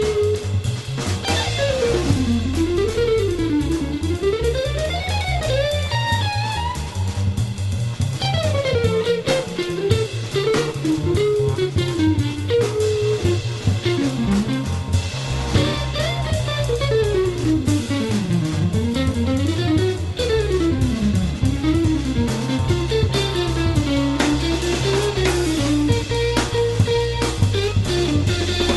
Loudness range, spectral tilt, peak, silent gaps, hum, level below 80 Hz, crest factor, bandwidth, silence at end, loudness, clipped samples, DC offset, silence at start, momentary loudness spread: 2 LU; -5.5 dB/octave; -2 dBFS; none; none; -32 dBFS; 16 dB; 12 kHz; 0 s; -20 LUFS; under 0.1%; under 0.1%; 0 s; 4 LU